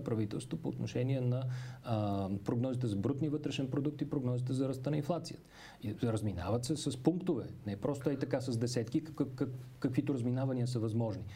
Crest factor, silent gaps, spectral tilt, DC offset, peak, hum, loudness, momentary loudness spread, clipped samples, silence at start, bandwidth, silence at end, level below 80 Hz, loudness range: 20 dB; none; -7 dB/octave; under 0.1%; -16 dBFS; none; -36 LUFS; 5 LU; under 0.1%; 0 s; 15 kHz; 0 s; -64 dBFS; 1 LU